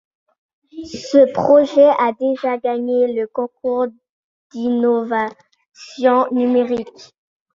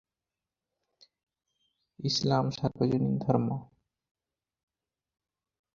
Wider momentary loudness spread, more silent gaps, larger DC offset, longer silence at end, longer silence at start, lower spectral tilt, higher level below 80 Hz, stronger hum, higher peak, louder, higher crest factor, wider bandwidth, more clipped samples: first, 15 LU vs 8 LU; first, 4.09-4.50 s vs none; neither; second, 0.5 s vs 2.1 s; second, 0.75 s vs 2 s; about the same, -6 dB/octave vs -6.5 dB/octave; about the same, -62 dBFS vs -64 dBFS; neither; first, -2 dBFS vs -10 dBFS; first, -17 LUFS vs -29 LUFS; second, 16 dB vs 24 dB; about the same, 7.6 kHz vs 7.4 kHz; neither